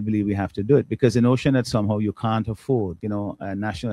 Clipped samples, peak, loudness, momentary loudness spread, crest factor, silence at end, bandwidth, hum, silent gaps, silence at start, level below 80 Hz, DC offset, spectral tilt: under 0.1%; -4 dBFS; -23 LUFS; 9 LU; 18 dB; 0 s; 12.5 kHz; none; none; 0 s; -50 dBFS; under 0.1%; -7.5 dB/octave